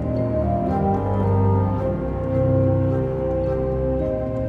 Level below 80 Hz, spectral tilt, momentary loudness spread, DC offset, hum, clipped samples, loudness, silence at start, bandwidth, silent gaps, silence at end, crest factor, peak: -32 dBFS; -11.5 dB/octave; 5 LU; under 0.1%; none; under 0.1%; -21 LUFS; 0 s; 4.6 kHz; none; 0 s; 12 dB; -8 dBFS